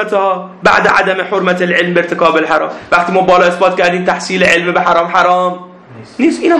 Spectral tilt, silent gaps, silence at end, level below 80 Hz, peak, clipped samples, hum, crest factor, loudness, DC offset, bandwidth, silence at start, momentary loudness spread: -5 dB/octave; none; 0 s; -48 dBFS; 0 dBFS; 0.4%; none; 12 dB; -11 LUFS; under 0.1%; 11 kHz; 0 s; 6 LU